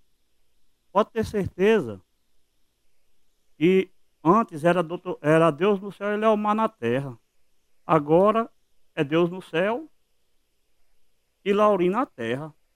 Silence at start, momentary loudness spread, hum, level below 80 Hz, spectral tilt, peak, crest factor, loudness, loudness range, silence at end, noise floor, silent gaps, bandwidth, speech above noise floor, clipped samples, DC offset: 0.95 s; 13 LU; none; -60 dBFS; -7 dB/octave; -6 dBFS; 20 dB; -23 LUFS; 5 LU; 0.25 s; -67 dBFS; none; 15 kHz; 45 dB; under 0.1%; under 0.1%